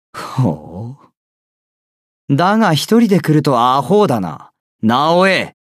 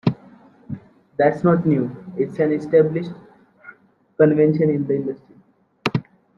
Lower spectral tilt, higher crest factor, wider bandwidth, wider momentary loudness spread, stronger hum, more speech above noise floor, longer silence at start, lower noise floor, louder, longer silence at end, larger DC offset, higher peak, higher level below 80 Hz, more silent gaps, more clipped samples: second, -6 dB/octave vs -9 dB/octave; about the same, 14 dB vs 18 dB; first, 15.5 kHz vs 7 kHz; second, 14 LU vs 19 LU; neither; first, over 77 dB vs 38 dB; about the same, 0.15 s vs 0.05 s; first, under -90 dBFS vs -56 dBFS; first, -14 LUFS vs -20 LUFS; second, 0.15 s vs 0.35 s; neither; about the same, -2 dBFS vs -2 dBFS; about the same, -58 dBFS vs -60 dBFS; first, 1.17-2.28 s, 4.60-4.79 s vs none; neither